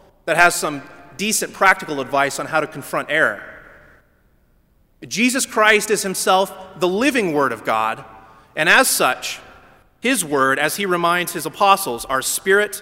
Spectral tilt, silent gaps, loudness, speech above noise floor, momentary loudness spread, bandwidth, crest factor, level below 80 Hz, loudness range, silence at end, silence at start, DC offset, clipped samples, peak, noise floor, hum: -2.5 dB/octave; none; -18 LUFS; 39 dB; 12 LU; 16.5 kHz; 20 dB; -54 dBFS; 3 LU; 0 s; 0.25 s; under 0.1%; under 0.1%; 0 dBFS; -57 dBFS; none